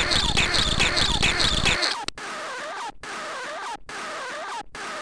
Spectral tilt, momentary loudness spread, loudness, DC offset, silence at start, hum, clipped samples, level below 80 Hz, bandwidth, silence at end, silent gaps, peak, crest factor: -2 dB/octave; 14 LU; -24 LUFS; under 0.1%; 0 s; none; under 0.1%; -34 dBFS; 10.5 kHz; 0 s; none; -6 dBFS; 18 dB